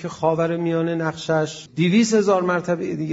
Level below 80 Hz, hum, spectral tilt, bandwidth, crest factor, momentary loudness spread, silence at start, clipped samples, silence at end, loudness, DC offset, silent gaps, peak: -62 dBFS; none; -5.5 dB/octave; 8 kHz; 14 dB; 7 LU; 0 s; under 0.1%; 0 s; -21 LUFS; under 0.1%; none; -6 dBFS